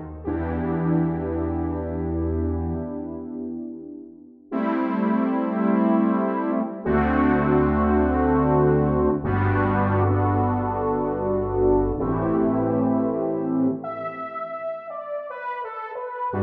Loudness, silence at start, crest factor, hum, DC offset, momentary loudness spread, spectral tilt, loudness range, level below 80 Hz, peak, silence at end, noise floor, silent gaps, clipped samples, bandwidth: -23 LUFS; 0 s; 14 dB; none; under 0.1%; 12 LU; -12 dB/octave; 7 LU; -38 dBFS; -8 dBFS; 0 s; -45 dBFS; none; under 0.1%; 4.3 kHz